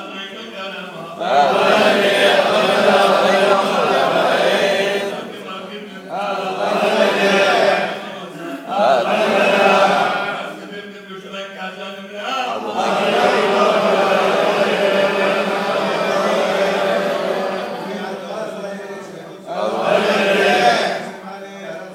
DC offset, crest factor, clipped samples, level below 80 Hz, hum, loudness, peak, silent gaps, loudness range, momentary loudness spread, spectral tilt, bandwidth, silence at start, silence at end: under 0.1%; 16 dB; under 0.1%; -72 dBFS; none; -16 LUFS; 0 dBFS; none; 7 LU; 17 LU; -4 dB/octave; 16 kHz; 0 s; 0 s